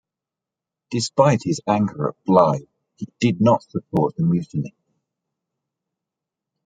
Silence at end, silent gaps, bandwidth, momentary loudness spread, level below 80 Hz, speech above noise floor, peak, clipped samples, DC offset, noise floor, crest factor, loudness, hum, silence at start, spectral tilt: 2 s; none; 9.4 kHz; 12 LU; -60 dBFS; 68 dB; -2 dBFS; under 0.1%; under 0.1%; -87 dBFS; 20 dB; -20 LUFS; none; 0.9 s; -6.5 dB/octave